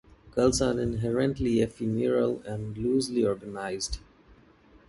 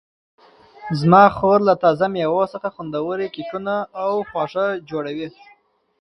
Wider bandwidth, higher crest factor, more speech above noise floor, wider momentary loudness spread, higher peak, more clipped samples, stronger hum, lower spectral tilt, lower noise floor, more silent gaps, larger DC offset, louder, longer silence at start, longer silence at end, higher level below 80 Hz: about the same, 11.5 kHz vs 10.5 kHz; about the same, 18 dB vs 20 dB; first, 30 dB vs 22 dB; second, 9 LU vs 15 LU; second, -10 dBFS vs 0 dBFS; neither; neither; second, -5.5 dB/octave vs -8 dB/octave; first, -57 dBFS vs -40 dBFS; neither; neither; second, -28 LUFS vs -19 LUFS; second, 0.25 s vs 0.8 s; first, 0.9 s vs 0.7 s; first, -46 dBFS vs -56 dBFS